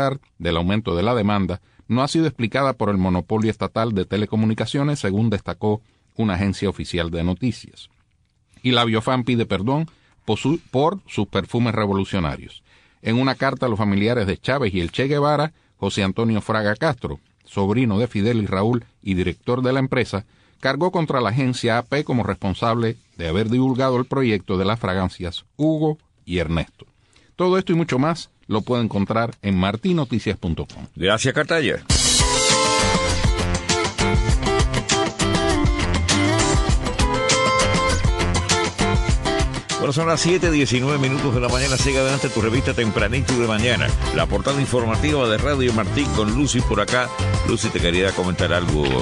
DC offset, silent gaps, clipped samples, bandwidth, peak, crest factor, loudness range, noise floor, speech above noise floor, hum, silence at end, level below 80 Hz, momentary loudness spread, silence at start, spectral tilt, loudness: under 0.1%; none; under 0.1%; 12.5 kHz; -2 dBFS; 18 dB; 4 LU; -63 dBFS; 43 dB; none; 0 s; -32 dBFS; 7 LU; 0 s; -5 dB/octave; -20 LUFS